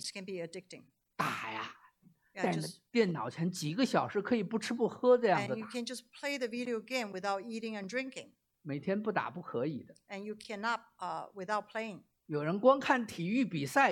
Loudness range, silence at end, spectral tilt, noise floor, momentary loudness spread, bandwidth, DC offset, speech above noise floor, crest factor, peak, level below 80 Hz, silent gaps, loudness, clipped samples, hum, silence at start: 6 LU; 0 s; -5 dB/octave; -66 dBFS; 16 LU; 15.5 kHz; under 0.1%; 32 dB; 22 dB; -12 dBFS; -80 dBFS; none; -34 LUFS; under 0.1%; none; 0 s